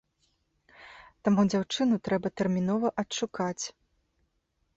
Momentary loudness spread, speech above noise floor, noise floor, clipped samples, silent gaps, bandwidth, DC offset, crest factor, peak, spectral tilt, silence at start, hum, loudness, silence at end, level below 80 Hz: 8 LU; 48 dB; -76 dBFS; under 0.1%; none; 8 kHz; under 0.1%; 18 dB; -12 dBFS; -5.5 dB/octave; 0.8 s; none; -29 LUFS; 1.05 s; -64 dBFS